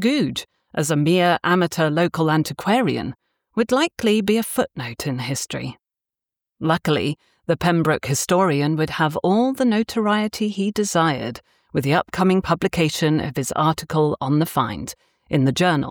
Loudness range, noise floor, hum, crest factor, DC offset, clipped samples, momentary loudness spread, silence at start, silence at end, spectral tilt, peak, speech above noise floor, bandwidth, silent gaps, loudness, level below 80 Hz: 3 LU; -88 dBFS; none; 16 dB; under 0.1%; under 0.1%; 9 LU; 0 s; 0 s; -5.5 dB/octave; -6 dBFS; 68 dB; over 20 kHz; none; -20 LUFS; -52 dBFS